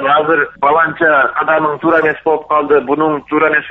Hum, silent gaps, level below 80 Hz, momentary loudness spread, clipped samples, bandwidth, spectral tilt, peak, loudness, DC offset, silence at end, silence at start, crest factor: none; none; -52 dBFS; 4 LU; under 0.1%; 4.1 kHz; -3 dB/octave; -2 dBFS; -12 LUFS; under 0.1%; 0 s; 0 s; 12 dB